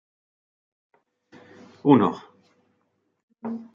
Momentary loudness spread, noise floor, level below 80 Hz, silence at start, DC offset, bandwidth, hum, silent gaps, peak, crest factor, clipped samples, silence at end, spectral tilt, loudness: 20 LU; -72 dBFS; -74 dBFS; 1.85 s; under 0.1%; 7 kHz; none; 3.23-3.28 s; -2 dBFS; 24 dB; under 0.1%; 0.1 s; -9 dB/octave; -22 LUFS